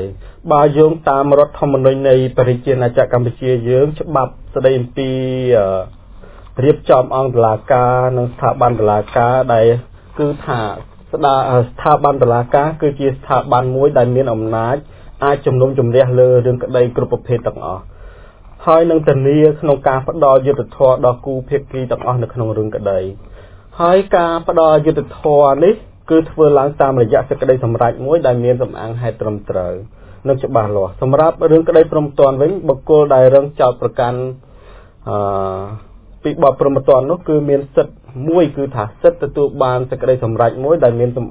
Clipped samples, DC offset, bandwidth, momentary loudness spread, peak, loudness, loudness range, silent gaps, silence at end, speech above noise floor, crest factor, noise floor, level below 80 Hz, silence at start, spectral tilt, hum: 0.1%; under 0.1%; 4 kHz; 10 LU; 0 dBFS; -14 LUFS; 4 LU; none; 0 s; 26 dB; 14 dB; -39 dBFS; -38 dBFS; 0 s; -11.5 dB/octave; none